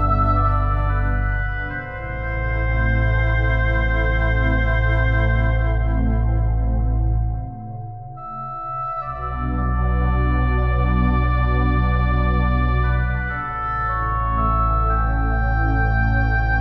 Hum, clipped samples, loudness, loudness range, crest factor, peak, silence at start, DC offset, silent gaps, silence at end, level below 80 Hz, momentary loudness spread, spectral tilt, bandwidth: none; under 0.1%; -21 LUFS; 5 LU; 12 dB; -6 dBFS; 0 s; under 0.1%; none; 0 s; -22 dBFS; 8 LU; -9.5 dB/octave; 4.3 kHz